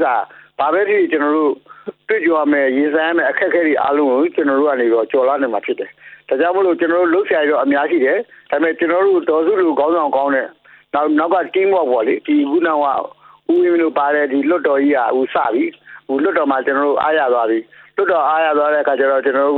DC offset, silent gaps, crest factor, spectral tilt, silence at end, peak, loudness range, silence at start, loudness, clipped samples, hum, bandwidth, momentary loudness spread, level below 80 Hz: under 0.1%; none; 12 dB; -8 dB/octave; 0 s; -4 dBFS; 1 LU; 0 s; -16 LUFS; under 0.1%; none; 4.3 kHz; 7 LU; -68 dBFS